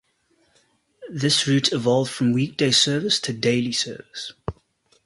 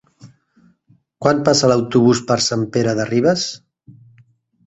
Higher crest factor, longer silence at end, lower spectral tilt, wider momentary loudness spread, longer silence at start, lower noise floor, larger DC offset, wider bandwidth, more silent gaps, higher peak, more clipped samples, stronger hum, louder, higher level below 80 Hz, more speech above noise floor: about the same, 20 dB vs 18 dB; second, 0.55 s vs 1.1 s; about the same, -4 dB/octave vs -5 dB/octave; first, 16 LU vs 7 LU; first, 1 s vs 0.25 s; first, -65 dBFS vs -57 dBFS; neither; first, 11.5 kHz vs 8.2 kHz; neither; second, -4 dBFS vs 0 dBFS; neither; neither; second, -21 LUFS vs -16 LUFS; about the same, -54 dBFS vs -54 dBFS; about the same, 43 dB vs 41 dB